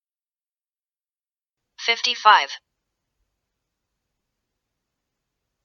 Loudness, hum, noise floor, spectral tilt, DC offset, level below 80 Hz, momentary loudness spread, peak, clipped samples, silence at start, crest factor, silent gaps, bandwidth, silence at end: -18 LUFS; none; under -90 dBFS; 2 dB/octave; under 0.1%; -82 dBFS; 15 LU; 0 dBFS; under 0.1%; 1.8 s; 26 dB; none; 7.2 kHz; 3.05 s